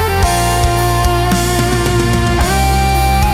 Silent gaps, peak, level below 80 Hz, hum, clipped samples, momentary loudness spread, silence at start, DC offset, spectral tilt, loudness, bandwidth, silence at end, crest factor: none; -2 dBFS; -18 dBFS; none; under 0.1%; 1 LU; 0 s; under 0.1%; -4.5 dB/octave; -13 LUFS; 16.5 kHz; 0 s; 10 dB